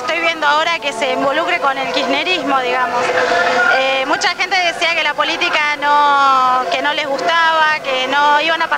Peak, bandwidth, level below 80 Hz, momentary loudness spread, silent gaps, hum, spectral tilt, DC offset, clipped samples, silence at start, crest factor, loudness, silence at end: 0 dBFS; 16 kHz; -58 dBFS; 4 LU; none; none; -1.5 dB/octave; under 0.1%; under 0.1%; 0 s; 14 dB; -14 LUFS; 0 s